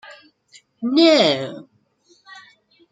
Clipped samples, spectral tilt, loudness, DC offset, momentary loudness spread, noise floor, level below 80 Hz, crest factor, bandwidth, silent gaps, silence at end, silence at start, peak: under 0.1%; -4.5 dB/octave; -16 LUFS; under 0.1%; 19 LU; -59 dBFS; -72 dBFS; 20 dB; 9.2 kHz; none; 0.5 s; 0.1 s; -2 dBFS